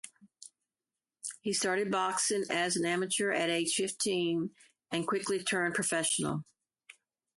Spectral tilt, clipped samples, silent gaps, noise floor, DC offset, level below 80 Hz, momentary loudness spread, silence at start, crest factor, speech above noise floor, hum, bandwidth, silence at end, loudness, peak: -3 dB/octave; under 0.1%; none; under -90 dBFS; under 0.1%; -74 dBFS; 9 LU; 0.05 s; 16 dB; over 58 dB; none; 12 kHz; 0.45 s; -31 LUFS; -18 dBFS